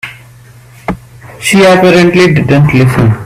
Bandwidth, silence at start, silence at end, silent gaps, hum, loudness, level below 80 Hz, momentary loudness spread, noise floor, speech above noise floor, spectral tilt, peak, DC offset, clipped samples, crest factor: 16 kHz; 0.05 s; 0 s; none; none; -6 LUFS; -34 dBFS; 18 LU; -35 dBFS; 30 dB; -6 dB/octave; 0 dBFS; under 0.1%; 0.2%; 8 dB